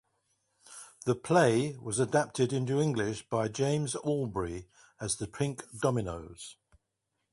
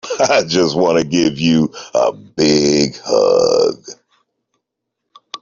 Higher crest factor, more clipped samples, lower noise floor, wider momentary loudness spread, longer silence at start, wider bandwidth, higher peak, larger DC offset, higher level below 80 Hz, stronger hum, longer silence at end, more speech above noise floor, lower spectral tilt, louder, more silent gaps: first, 20 dB vs 14 dB; neither; first, -83 dBFS vs -77 dBFS; first, 17 LU vs 6 LU; first, 0.7 s vs 0.05 s; first, 11.5 kHz vs 7.6 kHz; second, -10 dBFS vs -2 dBFS; neither; second, -58 dBFS vs -52 dBFS; neither; second, 0.8 s vs 1.5 s; second, 52 dB vs 63 dB; about the same, -5.5 dB/octave vs -4.5 dB/octave; second, -31 LUFS vs -14 LUFS; neither